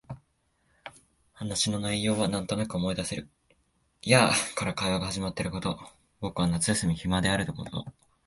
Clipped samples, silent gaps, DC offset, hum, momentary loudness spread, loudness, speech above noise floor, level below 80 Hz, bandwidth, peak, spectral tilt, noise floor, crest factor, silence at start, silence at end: under 0.1%; none; under 0.1%; none; 18 LU; -28 LUFS; 43 dB; -50 dBFS; 11.5 kHz; -4 dBFS; -4 dB/octave; -71 dBFS; 26 dB; 0.1 s; 0.35 s